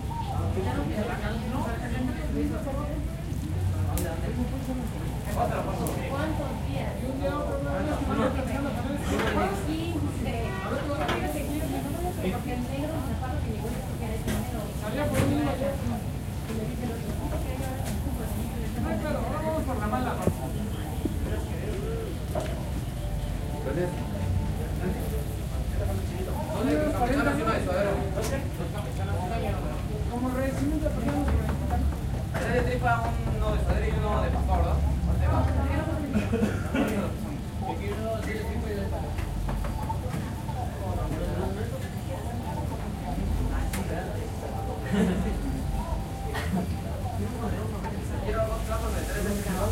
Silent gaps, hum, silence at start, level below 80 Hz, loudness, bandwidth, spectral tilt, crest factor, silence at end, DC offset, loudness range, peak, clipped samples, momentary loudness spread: none; none; 0 s; -34 dBFS; -30 LUFS; 16 kHz; -6.5 dB/octave; 18 dB; 0 s; under 0.1%; 5 LU; -10 dBFS; under 0.1%; 6 LU